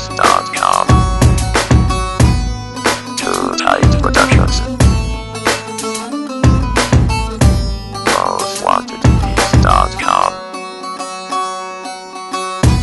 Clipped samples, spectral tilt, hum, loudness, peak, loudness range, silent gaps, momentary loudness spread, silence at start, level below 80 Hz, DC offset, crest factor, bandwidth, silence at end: 0.1%; -5 dB/octave; none; -14 LUFS; 0 dBFS; 2 LU; none; 12 LU; 0 s; -20 dBFS; under 0.1%; 14 dB; 12 kHz; 0 s